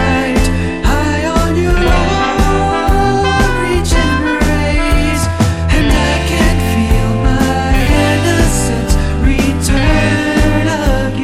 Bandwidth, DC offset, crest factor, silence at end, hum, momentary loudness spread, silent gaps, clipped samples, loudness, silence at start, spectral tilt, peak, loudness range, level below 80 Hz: 15.5 kHz; under 0.1%; 10 dB; 0 s; none; 3 LU; none; under 0.1%; -13 LUFS; 0 s; -5.5 dB/octave; 0 dBFS; 1 LU; -16 dBFS